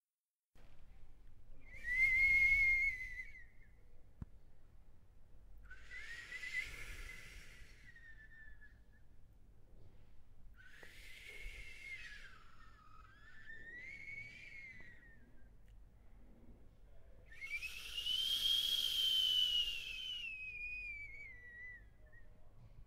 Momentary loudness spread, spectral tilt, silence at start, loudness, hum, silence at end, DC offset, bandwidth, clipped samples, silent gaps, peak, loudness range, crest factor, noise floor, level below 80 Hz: 28 LU; 0 dB/octave; 0.55 s; -36 LUFS; none; 0 s; under 0.1%; 16 kHz; under 0.1%; none; -24 dBFS; 21 LU; 20 dB; under -90 dBFS; -58 dBFS